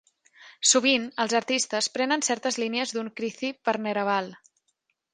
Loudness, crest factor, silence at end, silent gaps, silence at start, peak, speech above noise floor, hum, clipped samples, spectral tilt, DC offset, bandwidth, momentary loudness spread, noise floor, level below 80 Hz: -25 LUFS; 20 dB; 0.75 s; none; 0.4 s; -6 dBFS; 49 dB; none; under 0.1%; -1.5 dB/octave; under 0.1%; 10 kHz; 10 LU; -75 dBFS; -78 dBFS